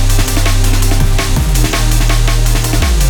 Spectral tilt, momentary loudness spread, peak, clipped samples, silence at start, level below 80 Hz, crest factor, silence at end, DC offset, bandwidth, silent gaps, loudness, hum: -4 dB/octave; 1 LU; 0 dBFS; under 0.1%; 0 s; -12 dBFS; 10 dB; 0 s; under 0.1%; 20 kHz; none; -13 LUFS; none